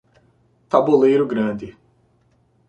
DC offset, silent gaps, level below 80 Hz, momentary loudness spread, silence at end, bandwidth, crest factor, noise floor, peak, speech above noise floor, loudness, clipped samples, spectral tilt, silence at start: under 0.1%; none; -60 dBFS; 16 LU; 1 s; 8.2 kHz; 20 dB; -60 dBFS; -2 dBFS; 43 dB; -18 LUFS; under 0.1%; -8 dB/octave; 0.75 s